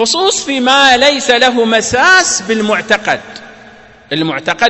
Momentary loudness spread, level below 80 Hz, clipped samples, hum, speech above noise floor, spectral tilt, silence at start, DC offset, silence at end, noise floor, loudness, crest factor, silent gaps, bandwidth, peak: 10 LU; -46 dBFS; 0.3%; none; 27 dB; -2 dB/octave; 0 s; under 0.1%; 0 s; -38 dBFS; -10 LUFS; 12 dB; none; 11 kHz; 0 dBFS